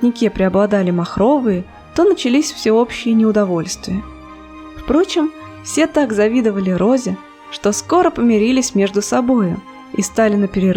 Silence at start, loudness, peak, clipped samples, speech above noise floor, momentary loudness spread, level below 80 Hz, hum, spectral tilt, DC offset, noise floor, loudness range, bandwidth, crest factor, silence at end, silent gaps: 0 s; -16 LUFS; -2 dBFS; under 0.1%; 21 dB; 11 LU; -42 dBFS; none; -5.5 dB/octave; under 0.1%; -36 dBFS; 3 LU; 16 kHz; 14 dB; 0 s; none